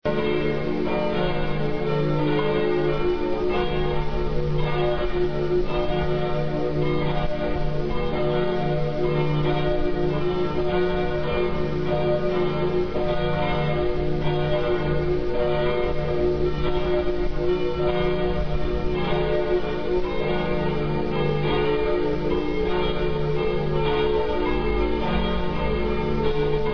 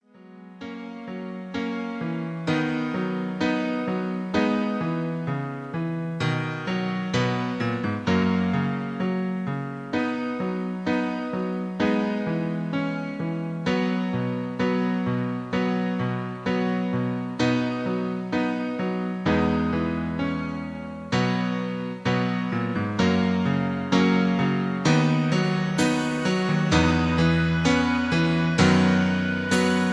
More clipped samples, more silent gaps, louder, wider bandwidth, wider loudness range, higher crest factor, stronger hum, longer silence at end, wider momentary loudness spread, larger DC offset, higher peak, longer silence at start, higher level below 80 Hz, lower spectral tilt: neither; neither; about the same, -24 LUFS vs -25 LUFS; second, 5.4 kHz vs 11 kHz; second, 1 LU vs 5 LU; second, 12 dB vs 18 dB; neither; about the same, 0 s vs 0 s; second, 3 LU vs 8 LU; first, 3% vs under 0.1%; second, -10 dBFS vs -6 dBFS; second, 0 s vs 0.2 s; first, -32 dBFS vs -48 dBFS; first, -8.5 dB/octave vs -6.5 dB/octave